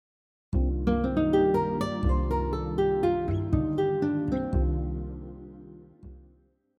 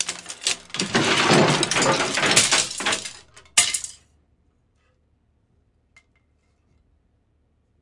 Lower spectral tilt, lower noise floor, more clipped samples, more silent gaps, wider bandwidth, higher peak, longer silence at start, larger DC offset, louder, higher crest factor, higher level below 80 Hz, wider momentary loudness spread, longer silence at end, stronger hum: first, -9 dB/octave vs -2 dB/octave; about the same, -62 dBFS vs -65 dBFS; neither; neither; about the same, 10.5 kHz vs 11.5 kHz; second, -12 dBFS vs 0 dBFS; first, 0.5 s vs 0 s; neither; second, -27 LUFS vs -19 LUFS; second, 16 dB vs 24 dB; first, -34 dBFS vs -60 dBFS; first, 14 LU vs 11 LU; second, 0.6 s vs 3.9 s; neither